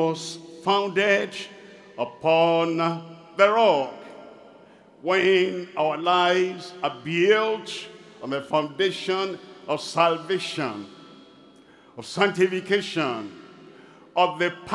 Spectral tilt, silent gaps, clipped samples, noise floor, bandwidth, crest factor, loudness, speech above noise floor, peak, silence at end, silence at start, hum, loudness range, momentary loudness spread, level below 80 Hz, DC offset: -4.5 dB/octave; none; under 0.1%; -52 dBFS; 12 kHz; 22 dB; -23 LUFS; 29 dB; -2 dBFS; 0 s; 0 s; none; 5 LU; 16 LU; -74 dBFS; under 0.1%